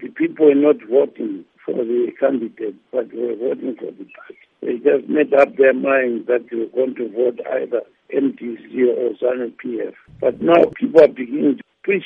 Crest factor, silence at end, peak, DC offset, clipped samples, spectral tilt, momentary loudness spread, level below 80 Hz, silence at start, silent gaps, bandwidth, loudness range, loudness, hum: 18 dB; 0 s; 0 dBFS; under 0.1%; under 0.1%; -8 dB/octave; 14 LU; -64 dBFS; 0 s; none; 5.6 kHz; 5 LU; -18 LUFS; none